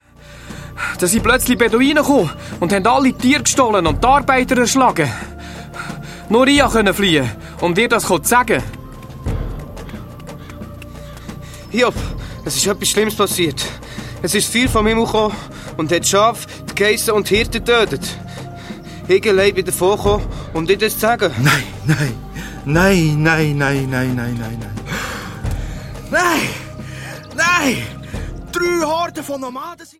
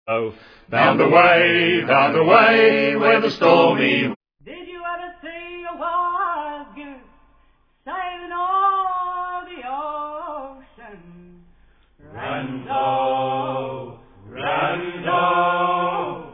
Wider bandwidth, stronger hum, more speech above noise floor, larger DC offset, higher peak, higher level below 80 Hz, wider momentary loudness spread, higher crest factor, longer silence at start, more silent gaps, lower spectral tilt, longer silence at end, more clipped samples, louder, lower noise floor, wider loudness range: first, 16.5 kHz vs 5.4 kHz; neither; second, 23 dB vs 42 dB; neither; about the same, 0 dBFS vs 0 dBFS; first, -34 dBFS vs -56 dBFS; about the same, 18 LU vs 20 LU; about the same, 16 dB vs 20 dB; first, 0.2 s vs 0.05 s; second, none vs 4.16-4.21 s; second, -4 dB/octave vs -7 dB/octave; about the same, 0.1 s vs 0 s; neither; about the same, -16 LUFS vs -18 LUFS; second, -38 dBFS vs -58 dBFS; second, 6 LU vs 14 LU